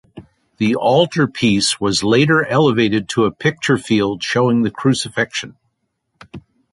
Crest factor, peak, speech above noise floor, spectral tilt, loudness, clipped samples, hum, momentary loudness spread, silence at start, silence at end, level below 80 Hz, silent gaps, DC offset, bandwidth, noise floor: 16 dB; -2 dBFS; 55 dB; -5 dB/octave; -16 LUFS; under 0.1%; none; 6 LU; 0.15 s; 0.35 s; -50 dBFS; none; under 0.1%; 11.5 kHz; -70 dBFS